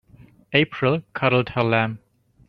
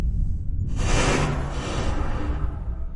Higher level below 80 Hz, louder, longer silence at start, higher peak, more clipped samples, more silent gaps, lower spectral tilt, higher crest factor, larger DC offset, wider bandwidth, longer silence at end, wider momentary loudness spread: second, -56 dBFS vs -26 dBFS; first, -21 LUFS vs -26 LUFS; first, 0.5 s vs 0 s; first, -2 dBFS vs -8 dBFS; neither; neither; first, -8.5 dB/octave vs -5 dB/octave; first, 22 dB vs 16 dB; neither; second, 5.6 kHz vs 11.5 kHz; first, 0.5 s vs 0 s; second, 4 LU vs 8 LU